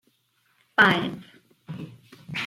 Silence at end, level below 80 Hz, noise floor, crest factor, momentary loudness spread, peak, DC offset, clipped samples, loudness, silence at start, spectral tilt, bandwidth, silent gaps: 0 s; -66 dBFS; -68 dBFS; 22 dB; 23 LU; -6 dBFS; under 0.1%; under 0.1%; -22 LUFS; 0.8 s; -5 dB/octave; 16 kHz; none